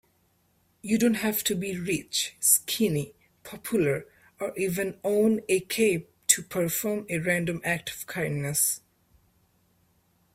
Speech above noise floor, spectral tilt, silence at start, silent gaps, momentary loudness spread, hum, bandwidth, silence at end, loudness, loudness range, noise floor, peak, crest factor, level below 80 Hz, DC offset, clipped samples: 41 dB; -3.5 dB/octave; 0.85 s; none; 10 LU; none; 16 kHz; 1.55 s; -26 LUFS; 3 LU; -68 dBFS; -4 dBFS; 24 dB; -62 dBFS; under 0.1%; under 0.1%